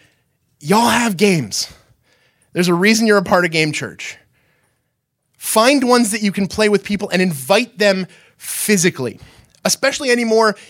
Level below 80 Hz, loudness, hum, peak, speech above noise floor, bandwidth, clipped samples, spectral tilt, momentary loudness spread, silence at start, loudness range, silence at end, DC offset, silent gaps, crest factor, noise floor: -54 dBFS; -15 LUFS; none; 0 dBFS; 55 dB; 17 kHz; under 0.1%; -4 dB/octave; 14 LU; 0.65 s; 2 LU; 0.1 s; under 0.1%; none; 18 dB; -71 dBFS